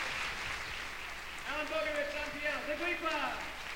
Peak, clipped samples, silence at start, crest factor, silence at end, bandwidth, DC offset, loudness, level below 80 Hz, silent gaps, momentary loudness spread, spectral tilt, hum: -22 dBFS; under 0.1%; 0 s; 16 dB; 0 s; 19 kHz; under 0.1%; -36 LUFS; -54 dBFS; none; 7 LU; -2.5 dB/octave; none